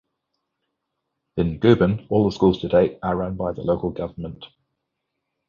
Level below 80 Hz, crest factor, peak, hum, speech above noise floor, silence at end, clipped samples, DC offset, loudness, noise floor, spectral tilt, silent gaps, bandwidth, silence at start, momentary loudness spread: -44 dBFS; 22 dB; -2 dBFS; none; 58 dB; 1.05 s; under 0.1%; under 0.1%; -21 LUFS; -79 dBFS; -8.5 dB/octave; none; 7.2 kHz; 1.35 s; 15 LU